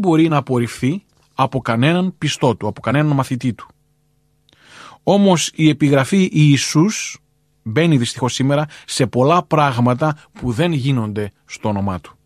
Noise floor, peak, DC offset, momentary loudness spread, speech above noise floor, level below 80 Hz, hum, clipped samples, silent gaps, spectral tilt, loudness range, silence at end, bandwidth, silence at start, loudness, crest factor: -61 dBFS; -2 dBFS; under 0.1%; 11 LU; 45 dB; -50 dBFS; none; under 0.1%; none; -5.5 dB/octave; 4 LU; 0.15 s; 13.5 kHz; 0 s; -17 LUFS; 16 dB